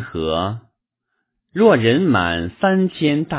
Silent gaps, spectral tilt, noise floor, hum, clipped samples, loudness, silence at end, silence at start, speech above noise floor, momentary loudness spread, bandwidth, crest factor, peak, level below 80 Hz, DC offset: none; -10.5 dB/octave; -75 dBFS; none; under 0.1%; -17 LUFS; 0 s; 0 s; 58 dB; 11 LU; 4 kHz; 18 dB; 0 dBFS; -42 dBFS; under 0.1%